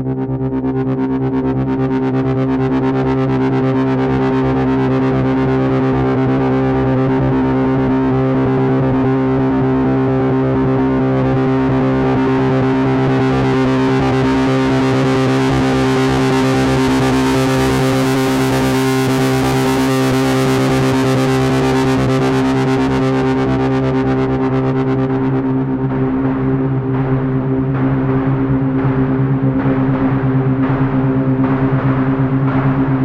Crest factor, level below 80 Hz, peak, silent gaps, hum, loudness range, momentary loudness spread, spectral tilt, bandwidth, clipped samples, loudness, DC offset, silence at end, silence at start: 10 dB; -34 dBFS; -4 dBFS; none; none; 2 LU; 2 LU; -7 dB/octave; 15 kHz; under 0.1%; -15 LUFS; under 0.1%; 0 s; 0 s